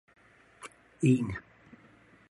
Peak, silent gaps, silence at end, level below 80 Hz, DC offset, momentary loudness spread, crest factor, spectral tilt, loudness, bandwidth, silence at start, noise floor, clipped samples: -12 dBFS; none; 0.9 s; -60 dBFS; under 0.1%; 23 LU; 22 dB; -7.5 dB/octave; -29 LUFS; 11.5 kHz; 0.6 s; -60 dBFS; under 0.1%